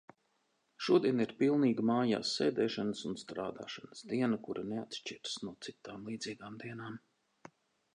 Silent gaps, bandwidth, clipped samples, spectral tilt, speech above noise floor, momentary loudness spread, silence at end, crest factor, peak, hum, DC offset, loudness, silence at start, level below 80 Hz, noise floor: none; 10.5 kHz; under 0.1%; -5.5 dB/octave; 43 dB; 16 LU; 0.95 s; 20 dB; -16 dBFS; none; under 0.1%; -35 LUFS; 0.8 s; -76 dBFS; -78 dBFS